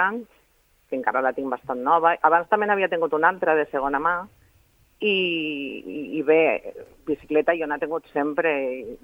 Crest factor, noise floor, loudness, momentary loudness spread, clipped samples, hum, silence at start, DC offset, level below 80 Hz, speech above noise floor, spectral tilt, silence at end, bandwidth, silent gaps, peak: 20 dB; -62 dBFS; -23 LUFS; 12 LU; under 0.1%; none; 0 s; under 0.1%; -60 dBFS; 39 dB; -6.5 dB/octave; 0.05 s; 16.5 kHz; none; -4 dBFS